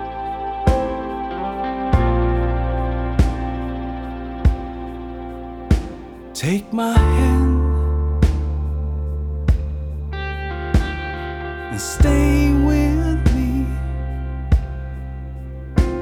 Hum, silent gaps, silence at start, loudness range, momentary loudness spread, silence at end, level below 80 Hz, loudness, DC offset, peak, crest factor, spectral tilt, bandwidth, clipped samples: none; none; 0 s; 5 LU; 14 LU; 0 s; -22 dBFS; -21 LUFS; under 0.1%; -2 dBFS; 18 dB; -7 dB/octave; 14.5 kHz; under 0.1%